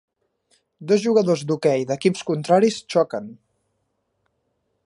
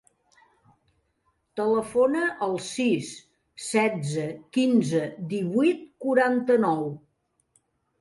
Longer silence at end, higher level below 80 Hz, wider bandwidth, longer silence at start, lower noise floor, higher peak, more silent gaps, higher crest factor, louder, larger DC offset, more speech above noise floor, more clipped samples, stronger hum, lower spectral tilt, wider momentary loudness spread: first, 1.55 s vs 1 s; about the same, -72 dBFS vs -70 dBFS; about the same, 11.5 kHz vs 11.5 kHz; second, 0.8 s vs 1.55 s; about the same, -73 dBFS vs -72 dBFS; first, -4 dBFS vs -8 dBFS; neither; about the same, 18 dB vs 18 dB; first, -20 LUFS vs -25 LUFS; neither; first, 53 dB vs 48 dB; neither; neither; about the same, -6 dB/octave vs -5.5 dB/octave; about the same, 10 LU vs 11 LU